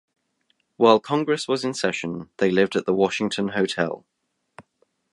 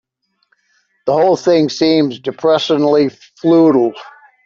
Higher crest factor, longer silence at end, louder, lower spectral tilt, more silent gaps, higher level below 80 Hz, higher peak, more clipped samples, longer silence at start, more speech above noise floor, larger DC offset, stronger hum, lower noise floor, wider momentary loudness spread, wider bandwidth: first, 22 dB vs 12 dB; first, 0.5 s vs 0.35 s; second, -22 LUFS vs -14 LUFS; about the same, -5 dB/octave vs -6 dB/octave; neither; about the same, -64 dBFS vs -60 dBFS; about the same, -2 dBFS vs -2 dBFS; neither; second, 0.8 s vs 1.05 s; about the same, 48 dB vs 50 dB; neither; neither; first, -70 dBFS vs -63 dBFS; about the same, 9 LU vs 9 LU; first, 11.5 kHz vs 7.4 kHz